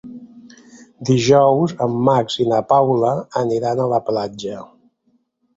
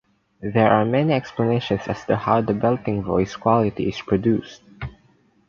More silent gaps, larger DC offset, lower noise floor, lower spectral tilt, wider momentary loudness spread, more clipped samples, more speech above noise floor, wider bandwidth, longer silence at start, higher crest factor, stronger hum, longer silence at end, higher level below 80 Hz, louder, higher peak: neither; neither; first, -64 dBFS vs -58 dBFS; about the same, -6.5 dB/octave vs -7.5 dB/octave; first, 15 LU vs 12 LU; neither; first, 47 dB vs 38 dB; first, 8 kHz vs 7.2 kHz; second, 0.05 s vs 0.4 s; about the same, 16 dB vs 18 dB; neither; first, 0.9 s vs 0.6 s; second, -56 dBFS vs -48 dBFS; first, -17 LUFS vs -21 LUFS; about the same, -2 dBFS vs -2 dBFS